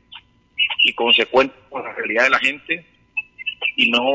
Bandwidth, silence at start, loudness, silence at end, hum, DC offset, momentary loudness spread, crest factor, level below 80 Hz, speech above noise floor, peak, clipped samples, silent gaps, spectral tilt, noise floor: 8 kHz; 0.1 s; -18 LUFS; 0 s; none; under 0.1%; 14 LU; 16 dB; -60 dBFS; 26 dB; -4 dBFS; under 0.1%; none; -2.5 dB/octave; -45 dBFS